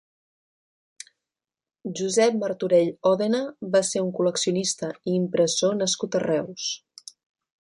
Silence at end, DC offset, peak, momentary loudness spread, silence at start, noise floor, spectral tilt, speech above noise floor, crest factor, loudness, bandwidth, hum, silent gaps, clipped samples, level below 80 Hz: 0.85 s; under 0.1%; -8 dBFS; 18 LU; 1.85 s; under -90 dBFS; -4 dB/octave; over 67 dB; 18 dB; -24 LUFS; 11.5 kHz; none; none; under 0.1%; -70 dBFS